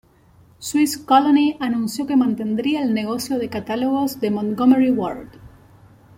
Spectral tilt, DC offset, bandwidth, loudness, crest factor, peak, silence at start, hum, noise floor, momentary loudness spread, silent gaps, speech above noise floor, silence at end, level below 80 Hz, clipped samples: -5 dB/octave; under 0.1%; 16.5 kHz; -19 LUFS; 16 dB; -4 dBFS; 0.6 s; none; -52 dBFS; 9 LU; none; 33 dB; 0.7 s; -56 dBFS; under 0.1%